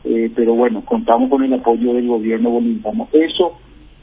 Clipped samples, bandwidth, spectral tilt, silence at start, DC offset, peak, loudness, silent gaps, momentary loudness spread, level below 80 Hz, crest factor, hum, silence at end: under 0.1%; 3.9 kHz; -10 dB/octave; 0.05 s; under 0.1%; 0 dBFS; -16 LUFS; none; 5 LU; -48 dBFS; 16 dB; none; 0.45 s